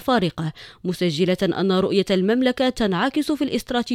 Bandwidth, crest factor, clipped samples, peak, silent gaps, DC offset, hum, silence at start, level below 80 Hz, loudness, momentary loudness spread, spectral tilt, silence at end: 15.5 kHz; 16 dB; under 0.1%; -6 dBFS; none; under 0.1%; none; 0 s; -48 dBFS; -21 LUFS; 8 LU; -6 dB/octave; 0 s